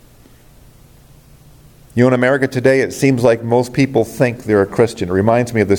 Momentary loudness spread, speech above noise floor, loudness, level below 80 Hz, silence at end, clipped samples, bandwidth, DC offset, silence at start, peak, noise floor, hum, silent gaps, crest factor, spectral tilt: 4 LU; 31 dB; -15 LUFS; -48 dBFS; 0 s; under 0.1%; 17.5 kHz; under 0.1%; 1.95 s; 0 dBFS; -45 dBFS; none; none; 16 dB; -6.5 dB/octave